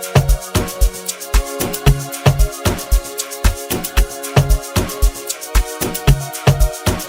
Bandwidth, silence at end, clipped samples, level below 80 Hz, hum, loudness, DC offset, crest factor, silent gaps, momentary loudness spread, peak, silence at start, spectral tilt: 16.5 kHz; 0 s; under 0.1%; -18 dBFS; none; -18 LUFS; under 0.1%; 16 dB; none; 5 LU; 0 dBFS; 0 s; -4.5 dB/octave